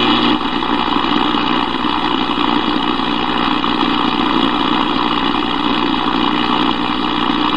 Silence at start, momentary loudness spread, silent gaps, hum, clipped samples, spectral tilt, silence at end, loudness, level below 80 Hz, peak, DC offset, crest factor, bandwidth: 0 s; 2 LU; none; 60 Hz at -30 dBFS; under 0.1%; -5.5 dB/octave; 0 s; -15 LUFS; -38 dBFS; 0 dBFS; 4%; 14 dB; 9.4 kHz